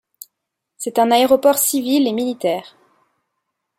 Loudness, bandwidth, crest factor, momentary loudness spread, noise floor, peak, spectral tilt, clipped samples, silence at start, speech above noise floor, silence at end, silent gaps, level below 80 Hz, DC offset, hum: -17 LUFS; 16 kHz; 18 dB; 9 LU; -79 dBFS; -2 dBFS; -2.5 dB/octave; under 0.1%; 0.8 s; 63 dB; 1.15 s; none; -64 dBFS; under 0.1%; none